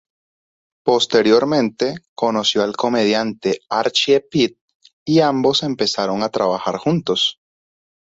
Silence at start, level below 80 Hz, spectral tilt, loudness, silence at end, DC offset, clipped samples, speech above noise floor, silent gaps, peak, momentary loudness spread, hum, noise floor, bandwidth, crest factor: 0.85 s; -60 dBFS; -4.5 dB/octave; -18 LUFS; 0.8 s; under 0.1%; under 0.1%; over 73 dB; 2.08-2.16 s, 4.61-4.68 s, 4.75-4.80 s, 4.93-5.06 s; -2 dBFS; 7 LU; none; under -90 dBFS; 8 kHz; 16 dB